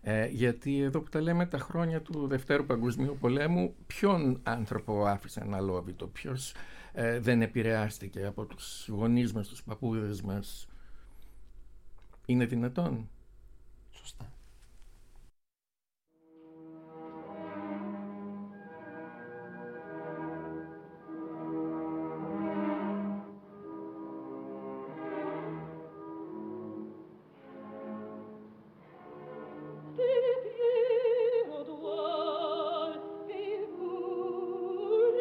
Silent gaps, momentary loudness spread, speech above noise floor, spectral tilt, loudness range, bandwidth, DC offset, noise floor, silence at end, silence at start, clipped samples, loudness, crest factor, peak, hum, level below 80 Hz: none; 19 LU; over 59 dB; -7 dB/octave; 14 LU; 16.5 kHz; under 0.1%; under -90 dBFS; 0 s; 0 s; under 0.1%; -33 LUFS; 20 dB; -14 dBFS; none; -56 dBFS